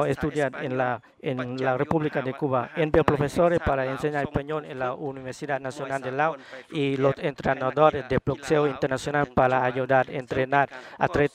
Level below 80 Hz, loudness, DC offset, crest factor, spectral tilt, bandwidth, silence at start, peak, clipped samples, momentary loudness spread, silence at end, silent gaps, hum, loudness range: -48 dBFS; -25 LUFS; under 0.1%; 24 dB; -6.5 dB/octave; 14.5 kHz; 0 s; -2 dBFS; under 0.1%; 9 LU; 0.05 s; none; none; 4 LU